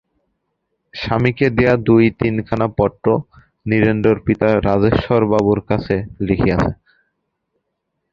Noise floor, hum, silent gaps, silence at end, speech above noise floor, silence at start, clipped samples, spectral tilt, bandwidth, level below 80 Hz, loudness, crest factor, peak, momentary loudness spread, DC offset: -74 dBFS; none; none; 1.4 s; 58 dB; 0.95 s; under 0.1%; -9 dB/octave; 7.2 kHz; -38 dBFS; -16 LUFS; 16 dB; 0 dBFS; 8 LU; under 0.1%